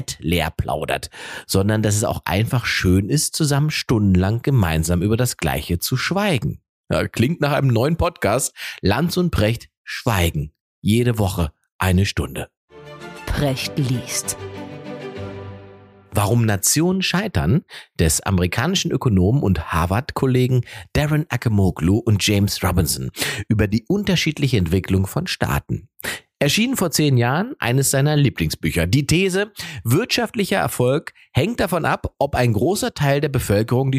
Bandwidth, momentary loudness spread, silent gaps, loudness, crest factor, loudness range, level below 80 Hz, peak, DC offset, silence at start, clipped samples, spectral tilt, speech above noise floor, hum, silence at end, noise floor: 15.5 kHz; 10 LU; 6.69-6.84 s, 9.77-9.85 s, 10.60-10.82 s, 11.72-11.79 s, 12.57-12.68 s; -20 LUFS; 18 dB; 4 LU; -36 dBFS; -2 dBFS; under 0.1%; 0 s; under 0.1%; -5 dB/octave; 25 dB; none; 0 s; -44 dBFS